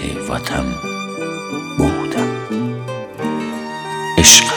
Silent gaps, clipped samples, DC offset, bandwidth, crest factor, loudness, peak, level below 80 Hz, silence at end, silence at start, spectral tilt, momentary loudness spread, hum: none; under 0.1%; under 0.1%; over 20 kHz; 18 dB; -17 LUFS; 0 dBFS; -34 dBFS; 0 s; 0 s; -2 dB/octave; 15 LU; none